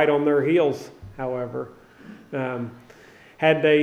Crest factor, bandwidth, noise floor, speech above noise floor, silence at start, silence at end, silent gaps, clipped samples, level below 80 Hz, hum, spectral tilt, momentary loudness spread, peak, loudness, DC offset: 18 dB; 9.4 kHz; -49 dBFS; 28 dB; 0 s; 0 s; none; under 0.1%; -58 dBFS; none; -7 dB/octave; 16 LU; -4 dBFS; -23 LUFS; under 0.1%